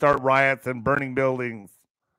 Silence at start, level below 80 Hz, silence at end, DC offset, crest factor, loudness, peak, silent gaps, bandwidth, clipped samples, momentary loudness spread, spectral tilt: 0 s; -54 dBFS; 0.5 s; under 0.1%; 18 dB; -23 LUFS; -6 dBFS; none; 15.5 kHz; under 0.1%; 12 LU; -6.5 dB/octave